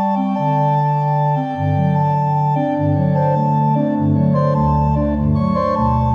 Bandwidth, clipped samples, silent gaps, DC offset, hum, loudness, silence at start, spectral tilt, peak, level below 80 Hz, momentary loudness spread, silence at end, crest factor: 5.6 kHz; under 0.1%; none; under 0.1%; none; -17 LUFS; 0 s; -10.5 dB/octave; -6 dBFS; -32 dBFS; 2 LU; 0 s; 10 dB